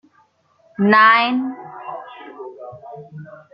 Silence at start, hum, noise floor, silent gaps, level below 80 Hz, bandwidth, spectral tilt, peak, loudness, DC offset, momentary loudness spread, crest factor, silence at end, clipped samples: 0.8 s; none; -59 dBFS; none; -68 dBFS; 5.8 kHz; -8 dB/octave; -2 dBFS; -14 LUFS; under 0.1%; 26 LU; 18 dB; 0.2 s; under 0.1%